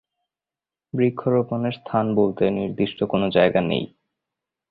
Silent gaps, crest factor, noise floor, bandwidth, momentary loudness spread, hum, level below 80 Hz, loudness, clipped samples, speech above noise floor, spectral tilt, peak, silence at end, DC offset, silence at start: none; 20 dB; under -90 dBFS; 4.9 kHz; 8 LU; none; -56 dBFS; -22 LUFS; under 0.1%; over 69 dB; -11 dB/octave; -4 dBFS; 0.85 s; under 0.1%; 0.95 s